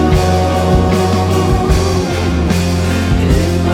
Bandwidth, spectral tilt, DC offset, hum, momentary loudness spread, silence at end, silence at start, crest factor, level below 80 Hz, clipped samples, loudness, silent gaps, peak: 16 kHz; -6 dB/octave; under 0.1%; none; 3 LU; 0 s; 0 s; 12 dB; -20 dBFS; under 0.1%; -13 LUFS; none; 0 dBFS